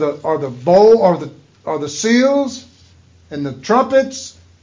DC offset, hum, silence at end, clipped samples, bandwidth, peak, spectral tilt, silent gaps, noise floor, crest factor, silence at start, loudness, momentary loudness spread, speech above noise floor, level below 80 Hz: under 0.1%; none; 0.35 s; under 0.1%; 7.6 kHz; -2 dBFS; -5 dB/octave; none; -47 dBFS; 14 dB; 0 s; -15 LUFS; 21 LU; 33 dB; -54 dBFS